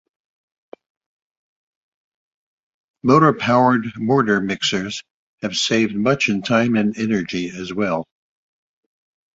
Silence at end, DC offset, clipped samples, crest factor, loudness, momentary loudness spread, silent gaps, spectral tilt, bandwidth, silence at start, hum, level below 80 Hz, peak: 1.35 s; under 0.1%; under 0.1%; 20 dB; -19 LUFS; 11 LU; 5.11-5.38 s; -5 dB/octave; 8 kHz; 3.05 s; none; -56 dBFS; -2 dBFS